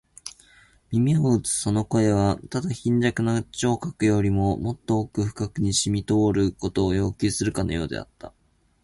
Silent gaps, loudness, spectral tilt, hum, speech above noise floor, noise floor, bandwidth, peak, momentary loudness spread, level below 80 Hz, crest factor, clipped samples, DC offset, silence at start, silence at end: none; -24 LUFS; -5.5 dB/octave; none; 33 dB; -56 dBFS; 11.5 kHz; -8 dBFS; 8 LU; -44 dBFS; 16 dB; under 0.1%; under 0.1%; 0.25 s; 0.55 s